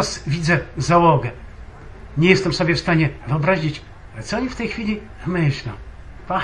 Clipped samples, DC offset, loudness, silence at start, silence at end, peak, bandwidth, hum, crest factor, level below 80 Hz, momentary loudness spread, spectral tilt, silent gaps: under 0.1%; under 0.1%; -19 LUFS; 0 s; 0 s; 0 dBFS; 10.5 kHz; none; 20 dB; -38 dBFS; 19 LU; -6 dB/octave; none